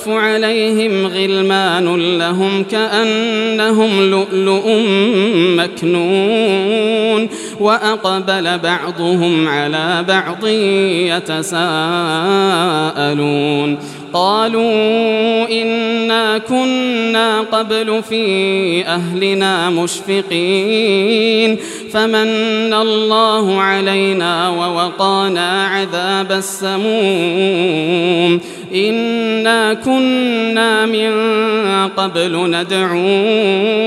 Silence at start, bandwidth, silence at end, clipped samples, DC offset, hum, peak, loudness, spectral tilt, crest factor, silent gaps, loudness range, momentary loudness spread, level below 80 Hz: 0 s; 13.5 kHz; 0 s; under 0.1%; under 0.1%; none; 0 dBFS; -14 LUFS; -4.5 dB/octave; 14 dB; none; 2 LU; 4 LU; -66 dBFS